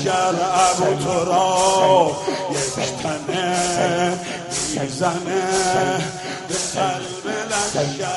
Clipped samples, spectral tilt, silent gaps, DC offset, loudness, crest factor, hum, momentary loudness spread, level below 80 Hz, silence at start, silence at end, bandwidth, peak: under 0.1%; -3.5 dB/octave; none; under 0.1%; -20 LUFS; 18 dB; none; 9 LU; -52 dBFS; 0 s; 0 s; 11.5 kHz; -2 dBFS